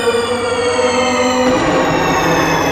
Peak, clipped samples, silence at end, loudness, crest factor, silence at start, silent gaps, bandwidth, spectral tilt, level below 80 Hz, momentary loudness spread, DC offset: -2 dBFS; under 0.1%; 0 s; -14 LUFS; 12 dB; 0 s; none; 15.5 kHz; -4 dB/octave; -38 dBFS; 3 LU; under 0.1%